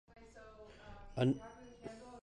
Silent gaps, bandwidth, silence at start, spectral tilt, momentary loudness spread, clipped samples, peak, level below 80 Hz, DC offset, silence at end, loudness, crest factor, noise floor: none; 9.8 kHz; 0.35 s; -7.5 dB/octave; 22 LU; under 0.1%; -20 dBFS; -62 dBFS; under 0.1%; 0.05 s; -39 LUFS; 22 dB; -57 dBFS